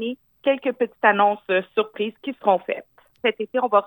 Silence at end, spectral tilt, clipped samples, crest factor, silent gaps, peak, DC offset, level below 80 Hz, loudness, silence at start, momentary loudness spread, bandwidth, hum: 0 s; -7.5 dB/octave; under 0.1%; 20 dB; none; -2 dBFS; under 0.1%; -76 dBFS; -22 LUFS; 0 s; 10 LU; 19 kHz; none